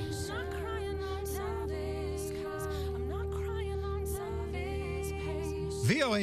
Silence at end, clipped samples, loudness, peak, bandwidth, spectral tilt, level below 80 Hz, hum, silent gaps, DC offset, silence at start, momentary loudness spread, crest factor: 0 s; under 0.1%; -36 LUFS; -16 dBFS; 15.5 kHz; -5.5 dB/octave; -42 dBFS; none; none; under 0.1%; 0 s; 4 LU; 18 dB